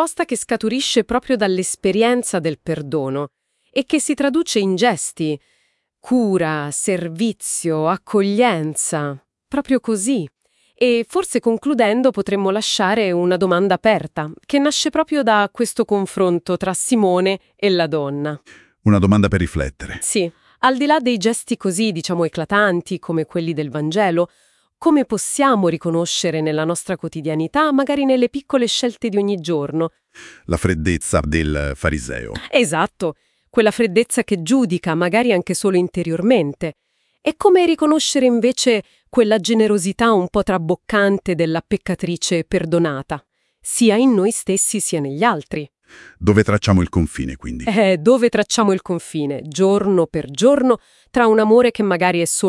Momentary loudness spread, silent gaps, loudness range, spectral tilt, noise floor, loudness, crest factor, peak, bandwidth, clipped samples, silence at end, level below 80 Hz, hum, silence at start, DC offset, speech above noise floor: 9 LU; none; 3 LU; -4.5 dB/octave; -64 dBFS; -18 LUFS; 18 dB; 0 dBFS; 12 kHz; under 0.1%; 0 s; -42 dBFS; none; 0 s; under 0.1%; 47 dB